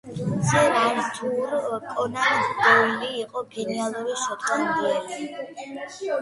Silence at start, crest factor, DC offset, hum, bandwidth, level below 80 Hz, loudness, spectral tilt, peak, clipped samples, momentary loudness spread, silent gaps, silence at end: 0.05 s; 20 dB; under 0.1%; none; 11.5 kHz; -60 dBFS; -23 LUFS; -4 dB/octave; -4 dBFS; under 0.1%; 14 LU; none; 0 s